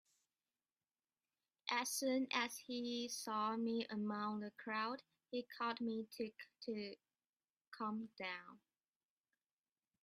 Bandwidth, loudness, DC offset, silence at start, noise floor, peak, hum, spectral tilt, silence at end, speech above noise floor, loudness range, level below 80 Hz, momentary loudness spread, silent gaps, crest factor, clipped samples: 15 kHz; -44 LUFS; under 0.1%; 1.65 s; under -90 dBFS; -22 dBFS; none; -3 dB/octave; 1.45 s; over 46 dB; 9 LU; under -90 dBFS; 11 LU; 7.26-7.33 s, 7.50-7.54 s, 7.67-7.71 s; 24 dB; under 0.1%